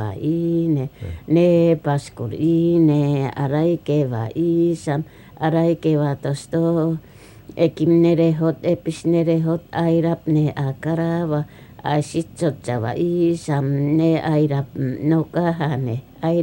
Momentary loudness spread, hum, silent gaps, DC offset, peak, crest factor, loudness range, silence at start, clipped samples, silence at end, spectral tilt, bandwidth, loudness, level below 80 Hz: 9 LU; none; none; under 0.1%; -6 dBFS; 14 dB; 3 LU; 0 s; under 0.1%; 0 s; -8 dB/octave; 16 kHz; -20 LUFS; -52 dBFS